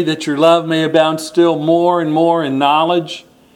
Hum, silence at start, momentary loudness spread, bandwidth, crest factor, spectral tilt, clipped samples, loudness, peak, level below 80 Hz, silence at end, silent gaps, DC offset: none; 0 s; 6 LU; 14 kHz; 14 dB; -5.5 dB/octave; under 0.1%; -13 LUFS; 0 dBFS; -64 dBFS; 0.35 s; none; under 0.1%